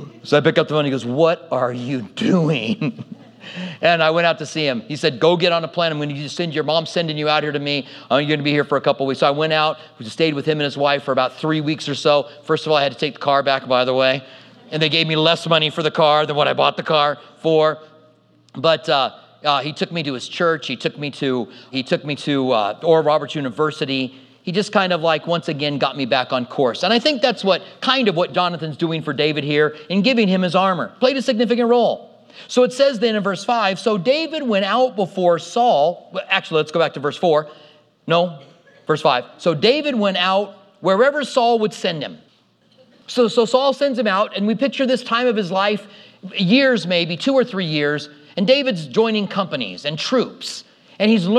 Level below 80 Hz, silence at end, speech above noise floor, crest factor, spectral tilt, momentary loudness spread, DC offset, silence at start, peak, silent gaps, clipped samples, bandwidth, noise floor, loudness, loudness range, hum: -76 dBFS; 0 s; 39 dB; 18 dB; -5.5 dB/octave; 8 LU; under 0.1%; 0 s; 0 dBFS; none; under 0.1%; 11 kHz; -57 dBFS; -18 LUFS; 3 LU; none